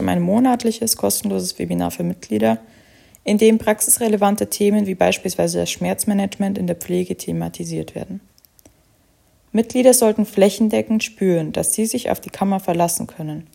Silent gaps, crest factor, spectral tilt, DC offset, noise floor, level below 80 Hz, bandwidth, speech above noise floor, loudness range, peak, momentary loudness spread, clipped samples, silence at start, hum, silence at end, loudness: none; 18 dB; -4.5 dB/octave; under 0.1%; -57 dBFS; -54 dBFS; 16.5 kHz; 39 dB; 6 LU; 0 dBFS; 11 LU; under 0.1%; 0 s; none; 0.1 s; -18 LUFS